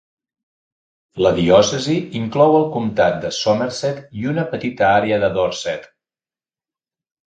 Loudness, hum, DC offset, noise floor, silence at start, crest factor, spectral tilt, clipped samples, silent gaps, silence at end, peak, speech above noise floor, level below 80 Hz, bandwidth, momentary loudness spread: -17 LUFS; none; under 0.1%; under -90 dBFS; 1.15 s; 18 dB; -5 dB/octave; under 0.1%; none; 1.45 s; 0 dBFS; over 73 dB; -50 dBFS; 9.2 kHz; 11 LU